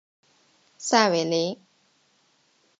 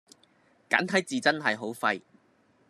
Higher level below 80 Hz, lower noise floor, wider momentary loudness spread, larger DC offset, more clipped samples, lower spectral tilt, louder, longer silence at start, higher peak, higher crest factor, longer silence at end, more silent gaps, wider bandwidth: about the same, -82 dBFS vs -82 dBFS; about the same, -65 dBFS vs -65 dBFS; first, 14 LU vs 5 LU; neither; neither; about the same, -3.5 dB/octave vs -3.5 dB/octave; first, -23 LUFS vs -27 LUFS; about the same, 0.8 s vs 0.7 s; about the same, -4 dBFS vs -6 dBFS; about the same, 24 dB vs 24 dB; first, 1.25 s vs 0.7 s; neither; second, 9.2 kHz vs 13 kHz